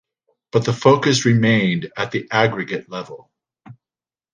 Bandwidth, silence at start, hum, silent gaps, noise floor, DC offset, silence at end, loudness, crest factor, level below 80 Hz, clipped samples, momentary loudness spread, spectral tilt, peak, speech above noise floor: 9.8 kHz; 0.55 s; none; none; under -90 dBFS; under 0.1%; 0.6 s; -18 LUFS; 18 dB; -58 dBFS; under 0.1%; 13 LU; -5.5 dB/octave; -2 dBFS; over 72 dB